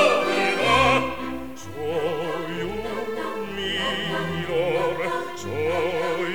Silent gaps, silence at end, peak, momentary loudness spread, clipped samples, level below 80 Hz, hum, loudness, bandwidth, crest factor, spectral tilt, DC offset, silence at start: none; 0 s; -6 dBFS; 11 LU; under 0.1%; -48 dBFS; none; -24 LUFS; 19.5 kHz; 18 dB; -4.5 dB/octave; 1%; 0 s